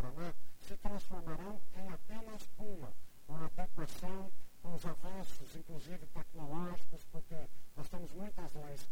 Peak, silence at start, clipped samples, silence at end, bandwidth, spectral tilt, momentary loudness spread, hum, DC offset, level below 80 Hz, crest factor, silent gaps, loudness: -20 dBFS; 0 s; under 0.1%; 0 s; 16 kHz; -6 dB/octave; 8 LU; none; under 0.1%; -50 dBFS; 10 dB; none; -49 LUFS